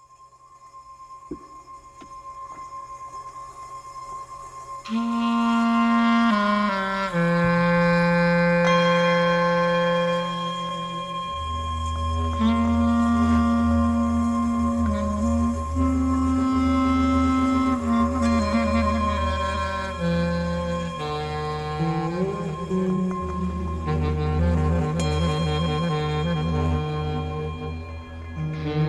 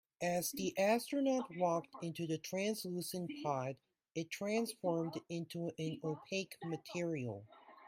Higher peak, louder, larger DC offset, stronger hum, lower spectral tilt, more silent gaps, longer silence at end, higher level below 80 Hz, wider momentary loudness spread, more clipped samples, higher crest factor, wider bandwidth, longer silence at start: first, -8 dBFS vs -22 dBFS; first, -23 LUFS vs -39 LUFS; neither; neither; first, -7 dB/octave vs -5 dB/octave; neither; about the same, 0 s vs 0 s; first, -34 dBFS vs -80 dBFS; first, 18 LU vs 10 LU; neither; about the same, 16 dB vs 18 dB; second, 11.5 kHz vs 16 kHz; about the same, 0.2 s vs 0.2 s